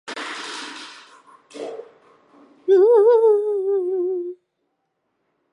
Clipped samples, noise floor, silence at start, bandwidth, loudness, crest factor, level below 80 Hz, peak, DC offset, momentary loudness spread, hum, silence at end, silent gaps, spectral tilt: under 0.1%; -74 dBFS; 0.05 s; 11 kHz; -18 LUFS; 16 dB; -86 dBFS; -6 dBFS; under 0.1%; 21 LU; none; 1.2 s; none; -3 dB/octave